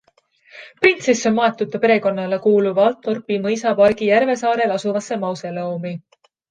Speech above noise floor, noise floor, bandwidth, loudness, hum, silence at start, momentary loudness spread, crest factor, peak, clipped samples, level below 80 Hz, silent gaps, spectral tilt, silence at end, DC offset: 39 dB; -56 dBFS; 9.6 kHz; -18 LUFS; none; 0.55 s; 10 LU; 18 dB; 0 dBFS; under 0.1%; -62 dBFS; none; -5 dB/octave; 0.5 s; under 0.1%